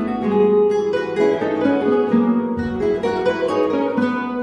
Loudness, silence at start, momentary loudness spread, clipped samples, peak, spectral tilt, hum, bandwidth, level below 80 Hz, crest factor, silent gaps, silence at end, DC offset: -18 LUFS; 0 s; 5 LU; under 0.1%; -4 dBFS; -7.5 dB/octave; none; 9.6 kHz; -48 dBFS; 14 dB; none; 0 s; under 0.1%